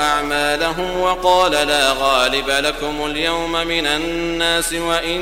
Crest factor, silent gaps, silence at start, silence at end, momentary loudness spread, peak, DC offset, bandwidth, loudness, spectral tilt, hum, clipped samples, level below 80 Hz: 16 dB; none; 0 s; 0 s; 5 LU; 0 dBFS; 0.1%; 16 kHz; -17 LUFS; -2.5 dB/octave; none; under 0.1%; -36 dBFS